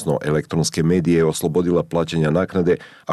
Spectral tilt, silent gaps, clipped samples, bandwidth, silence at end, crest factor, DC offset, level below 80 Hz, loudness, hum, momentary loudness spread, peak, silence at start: -6 dB/octave; none; under 0.1%; 13 kHz; 0 s; 12 dB; under 0.1%; -46 dBFS; -19 LUFS; none; 4 LU; -8 dBFS; 0 s